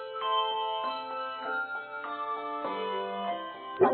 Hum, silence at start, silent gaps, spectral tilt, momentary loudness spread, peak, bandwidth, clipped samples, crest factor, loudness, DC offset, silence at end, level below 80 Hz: none; 0 s; none; -1 dB/octave; 8 LU; -10 dBFS; 4.6 kHz; under 0.1%; 22 dB; -33 LUFS; under 0.1%; 0 s; -82 dBFS